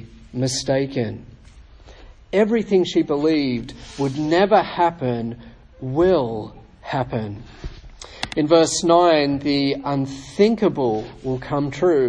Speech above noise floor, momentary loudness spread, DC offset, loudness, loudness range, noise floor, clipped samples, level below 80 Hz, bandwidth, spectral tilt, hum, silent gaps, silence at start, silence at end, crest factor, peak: 26 dB; 19 LU; under 0.1%; -20 LUFS; 5 LU; -45 dBFS; under 0.1%; -46 dBFS; 10.5 kHz; -5.5 dB/octave; none; none; 0 s; 0 s; 18 dB; -2 dBFS